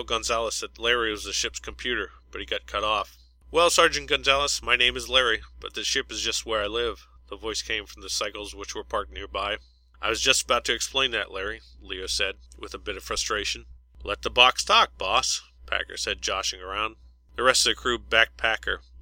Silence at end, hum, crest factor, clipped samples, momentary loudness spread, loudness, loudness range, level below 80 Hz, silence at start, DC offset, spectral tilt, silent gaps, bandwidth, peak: 0.05 s; none; 26 dB; under 0.1%; 15 LU; -24 LUFS; 7 LU; -46 dBFS; 0 s; under 0.1%; -1 dB/octave; none; 16.5 kHz; 0 dBFS